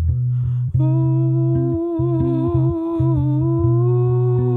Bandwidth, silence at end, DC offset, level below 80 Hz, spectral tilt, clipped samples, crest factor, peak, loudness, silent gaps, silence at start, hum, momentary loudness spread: 1.7 kHz; 0 s; under 0.1%; -34 dBFS; -13 dB/octave; under 0.1%; 10 dB; -6 dBFS; -18 LUFS; none; 0 s; none; 3 LU